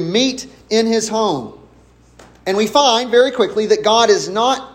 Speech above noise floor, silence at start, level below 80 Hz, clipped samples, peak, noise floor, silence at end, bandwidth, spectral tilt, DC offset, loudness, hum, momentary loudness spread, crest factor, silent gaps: 33 dB; 0 s; -52 dBFS; under 0.1%; 0 dBFS; -48 dBFS; 0.05 s; 16 kHz; -3 dB/octave; under 0.1%; -15 LUFS; none; 10 LU; 16 dB; none